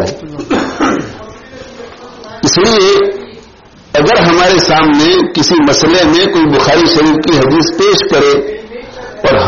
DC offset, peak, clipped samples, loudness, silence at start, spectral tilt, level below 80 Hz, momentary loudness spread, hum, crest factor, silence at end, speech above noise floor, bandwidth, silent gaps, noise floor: under 0.1%; 0 dBFS; under 0.1%; -9 LUFS; 0 s; -3 dB/octave; -36 dBFS; 19 LU; none; 10 dB; 0 s; 29 dB; 7.4 kHz; none; -38 dBFS